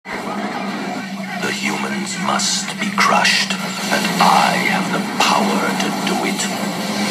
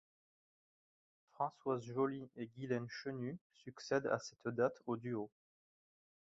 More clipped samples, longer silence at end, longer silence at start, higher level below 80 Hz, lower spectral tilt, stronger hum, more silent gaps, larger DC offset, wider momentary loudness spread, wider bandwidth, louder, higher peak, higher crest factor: neither; second, 0 s vs 0.95 s; second, 0.05 s vs 1.4 s; first, -64 dBFS vs -82 dBFS; second, -3 dB/octave vs -5.5 dB/octave; neither; second, none vs 3.41-3.50 s; neither; about the same, 11 LU vs 12 LU; first, 15 kHz vs 7.6 kHz; first, -17 LUFS vs -41 LUFS; first, 0 dBFS vs -22 dBFS; about the same, 18 dB vs 22 dB